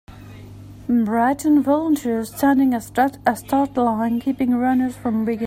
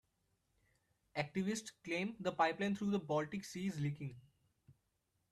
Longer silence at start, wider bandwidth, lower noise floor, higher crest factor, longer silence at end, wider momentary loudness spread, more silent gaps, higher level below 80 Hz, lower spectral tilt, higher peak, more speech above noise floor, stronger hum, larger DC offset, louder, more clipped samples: second, 0.1 s vs 1.15 s; first, 16 kHz vs 13.5 kHz; second, -39 dBFS vs -83 dBFS; second, 16 dB vs 22 dB; second, 0 s vs 0.6 s; about the same, 6 LU vs 8 LU; neither; first, -50 dBFS vs -74 dBFS; about the same, -6 dB/octave vs -5.5 dB/octave; first, -4 dBFS vs -20 dBFS; second, 20 dB vs 44 dB; neither; neither; first, -19 LUFS vs -40 LUFS; neither